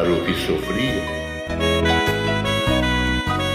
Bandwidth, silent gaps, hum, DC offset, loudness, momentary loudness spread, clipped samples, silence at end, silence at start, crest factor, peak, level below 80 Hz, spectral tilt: 16 kHz; none; none; under 0.1%; -20 LUFS; 6 LU; under 0.1%; 0 s; 0 s; 16 dB; -4 dBFS; -32 dBFS; -5 dB/octave